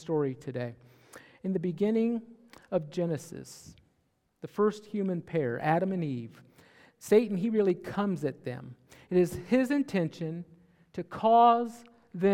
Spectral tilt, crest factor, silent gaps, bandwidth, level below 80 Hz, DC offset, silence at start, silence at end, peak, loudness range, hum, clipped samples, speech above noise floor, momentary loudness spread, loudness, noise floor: -7 dB/octave; 18 dB; none; 16 kHz; -70 dBFS; under 0.1%; 0 s; 0 s; -12 dBFS; 6 LU; none; under 0.1%; 45 dB; 19 LU; -29 LUFS; -74 dBFS